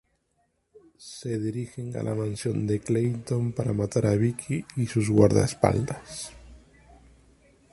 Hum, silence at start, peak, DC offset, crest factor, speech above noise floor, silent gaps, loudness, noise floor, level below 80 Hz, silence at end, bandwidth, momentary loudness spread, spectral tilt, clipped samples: none; 1 s; -4 dBFS; under 0.1%; 24 dB; 47 dB; none; -26 LUFS; -72 dBFS; -50 dBFS; 1.15 s; 11.5 kHz; 16 LU; -7 dB/octave; under 0.1%